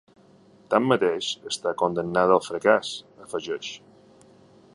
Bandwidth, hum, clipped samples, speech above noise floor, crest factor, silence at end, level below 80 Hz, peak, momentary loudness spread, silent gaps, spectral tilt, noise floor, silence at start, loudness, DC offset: 11.5 kHz; none; under 0.1%; 31 dB; 22 dB; 0.95 s; -64 dBFS; -4 dBFS; 14 LU; none; -4.5 dB/octave; -55 dBFS; 0.7 s; -24 LUFS; under 0.1%